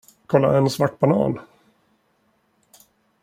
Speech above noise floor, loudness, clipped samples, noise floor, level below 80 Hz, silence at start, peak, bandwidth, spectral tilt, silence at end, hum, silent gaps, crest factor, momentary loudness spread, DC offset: 47 dB; -20 LUFS; under 0.1%; -65 dBFS; -58 dBFS; 0.3 s; -2 dBFS; 16 kHz; -7 dB/octave; 1.8 s; none; none; 20 dB; 7 LU; under 0.1%